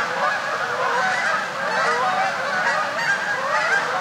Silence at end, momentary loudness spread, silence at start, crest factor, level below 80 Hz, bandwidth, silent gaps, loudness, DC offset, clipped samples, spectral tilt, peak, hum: 0 s; 3 LU; 0 s; 14 dB; -72 dBFS; 16.5 kHz; none; -21 LUFS; under 0.1%; under 0.1%; -2 dB/octave; -8 dBFS; none